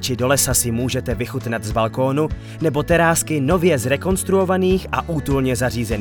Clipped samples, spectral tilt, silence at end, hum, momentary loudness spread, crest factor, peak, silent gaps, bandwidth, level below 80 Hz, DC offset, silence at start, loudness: under 0.1%; -4.5 dB/octave; 0 s; none; 8 LU; 16 dB; -4 dBFS; none; 19 kHz; -34 dBFS; under 0.1%; 0 s; -19 LUFS